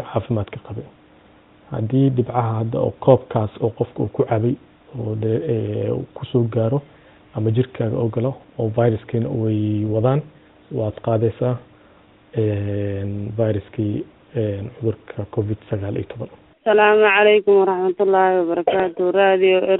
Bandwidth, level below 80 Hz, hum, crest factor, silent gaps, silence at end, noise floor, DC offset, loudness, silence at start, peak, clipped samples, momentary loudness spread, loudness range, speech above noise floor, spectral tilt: 4 kHz; -54 dBFS; none; 20 dB; none; 0 s; -51 dBFS; under 0.1%; -20 LUFS; 0 s; 0 dBFS; under 0.1%; 13 LU; 8 LU; 31 dB; -6 dB/octave